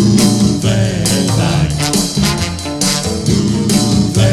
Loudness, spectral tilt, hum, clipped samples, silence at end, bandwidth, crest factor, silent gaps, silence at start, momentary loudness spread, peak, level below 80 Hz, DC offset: -13 LUFS; -4.5 dB/octave; none; under 0.1%; 0 s; 15.5 kHz; 12 dB; none; 0 s; 4 LU; 0 dBFS; -30 dBFS; under 0.1%